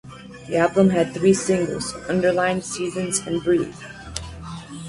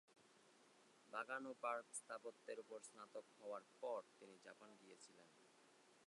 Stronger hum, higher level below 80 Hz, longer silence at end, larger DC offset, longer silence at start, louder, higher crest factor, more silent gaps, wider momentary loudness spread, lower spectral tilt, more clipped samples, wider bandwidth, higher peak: neither; first, -48 dBFS vs under -90 dBFS; about the same, 0 s vs 0 s; neither; about the same, 0.05 s vs 0.1 s; first, -21 LUFS vs -53 LUFS; second, 18 dB vs 24 dB; neither; about the same, 17 LU vs 17 LU; first, -5 dB/octave vs -2 dB/octave; neither; about the same, 11.5 kHz vs 11 kHz; first, -4 dBFS vs -32 dBFS